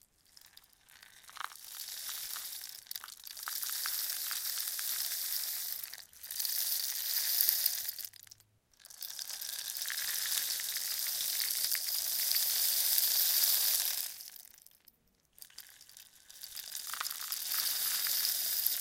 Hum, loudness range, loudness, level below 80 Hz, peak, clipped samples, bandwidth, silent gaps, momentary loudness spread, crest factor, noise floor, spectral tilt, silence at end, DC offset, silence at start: none; 12 LU; -32 LUFS; -80 dBFS; -6 dBFS; under 0.1%; 17 kHz; none; 18 LU; 30 dB; -68 dBFS; 4 dB/octave; 0 s; under 0.1%; 0.9 s